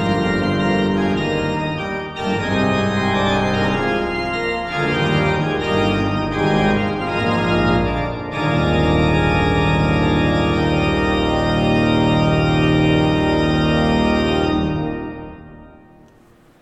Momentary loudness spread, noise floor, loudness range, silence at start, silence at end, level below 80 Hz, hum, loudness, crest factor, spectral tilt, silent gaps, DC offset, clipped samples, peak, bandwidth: 6 LU; -50 dBFS; 3 LU; 0 s; 0.9 s; -32 dBFS; none; -18 LUFS; 14 dB; -7 dB/octave; none; under 0.1%; under 0.1%; -4 dBFS; 9.8 kHz